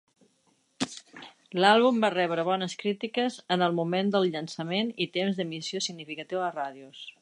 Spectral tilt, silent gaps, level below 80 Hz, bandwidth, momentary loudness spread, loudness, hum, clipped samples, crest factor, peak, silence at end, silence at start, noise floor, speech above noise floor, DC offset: -4.5 dB/octave; none; -80 dBFS; 11 kHz; 15 LU; -28 LUFS; none; under 0.1%; 22 dB; -6 dBFS; 0.1 s; 0.8 s; -69 dBFS; 42 dB; under 0.1%